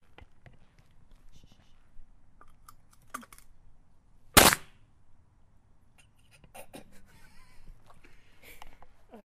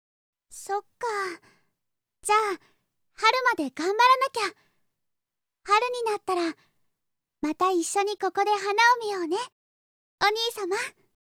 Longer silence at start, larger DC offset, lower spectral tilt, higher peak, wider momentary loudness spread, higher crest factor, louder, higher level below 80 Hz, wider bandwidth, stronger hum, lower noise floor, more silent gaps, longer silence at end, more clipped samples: first, 1.95 s vs 0.5 s; neither; about the same, -2 dB/octave vs -1 dB/octave; first, -2 dBFS vs -6 dBFS; first, 33 LU vs 13 LU; first, 32 dB vs 20 dB; first, -21 LUFS vs -25 LUFS; first, -52 dBFS vs -72 dBFS; about the same, 15.5 kHz vs 17 kHz; neither; second, -59 dBFS vs -84 dBFS; second, none vs 9.52-10.18 s; first, 0.6 s vs 0.45 s; neither